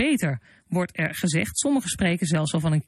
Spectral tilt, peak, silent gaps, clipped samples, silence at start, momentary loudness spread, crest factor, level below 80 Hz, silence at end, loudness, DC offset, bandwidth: -5 dB/octave; -10 dBFS; none; under 0.1%; 0 s; 6 LU; 14 dB; -52 dBFS; 0.05 s; -24 LUFS; under 0.1%; 13.5 kHz